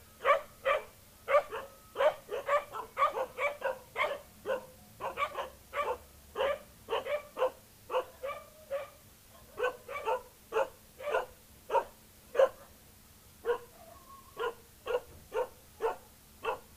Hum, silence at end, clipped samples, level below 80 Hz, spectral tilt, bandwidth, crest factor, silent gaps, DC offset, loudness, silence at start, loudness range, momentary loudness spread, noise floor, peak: none; 0 s; under 0.1%; -64 dBFS; -3 dB/octave; 15.5 kHz; 22 dB; none; under 0.1%; -35 LUFS; 0.2 s; 6 LU; 17 LU; -58 dBFS; -14 dBFS